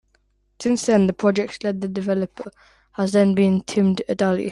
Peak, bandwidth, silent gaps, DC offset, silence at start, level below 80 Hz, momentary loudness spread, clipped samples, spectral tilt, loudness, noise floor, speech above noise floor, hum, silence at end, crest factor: -6 dBFS; 11 kHz; none; under 0.1%; 0.6 s; -60 dBFS; 11 LU; under 0.1%; -6.5 dB/octave; -21 LUFS; -64 dBFS; 44 dB; none; 0 s; 16 dB